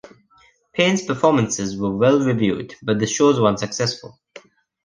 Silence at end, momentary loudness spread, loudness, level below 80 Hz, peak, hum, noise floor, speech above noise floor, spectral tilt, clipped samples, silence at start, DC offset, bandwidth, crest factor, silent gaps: 0.8 s; 8 LU; -19 LUFS; -54 dBFS; -2 dBFS; none; -56 dBFS; 37 dB; -5 dB/octave; under 0.1%; 0.75 s; under 0.1%; 10.5 kHz; 18 dB; none